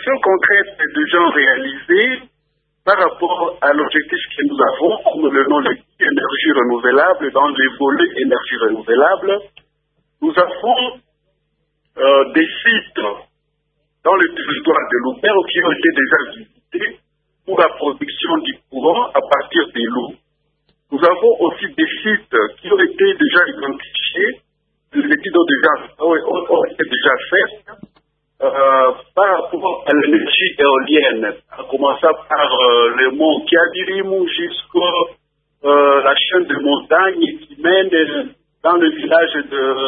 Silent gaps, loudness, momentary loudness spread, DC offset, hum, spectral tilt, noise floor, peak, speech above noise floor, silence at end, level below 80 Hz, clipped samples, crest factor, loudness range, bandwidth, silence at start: none; -15 LUFS; 9 LU; under 0.1%; none; -6.5 dB/octave; -68 dBFS; 0 dBFS; 53 dB; 0 s; -60 dBFS; under 0.1%; 16 dB; 3 LU; 4.6 kHz; 0 s